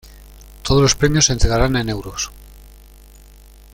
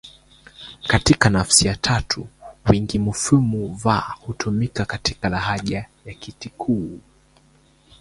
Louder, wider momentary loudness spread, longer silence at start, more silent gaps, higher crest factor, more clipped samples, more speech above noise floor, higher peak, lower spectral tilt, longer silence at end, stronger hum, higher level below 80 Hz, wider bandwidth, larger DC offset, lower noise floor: first, -17 LUFS vs -20 LUFS; second, 12 LU vs 20 LU; first, 0.4 s vs 0.05 s; neither; about the same, 18 dB vs 22 dB; neither; second, 27 dB vs 35 dB; about the same, -2 dBFS vs 0 dBFS; about the same, -4 dB/octave vs -4 dB/octave; about the same, 1.1 s vs 1.05 s; neither; first, -28 dBFS vs -40 dBFS; first, 16.5 kHz vs 11.5 kHz; neither; second, -43 dBFS vs -56 dBFS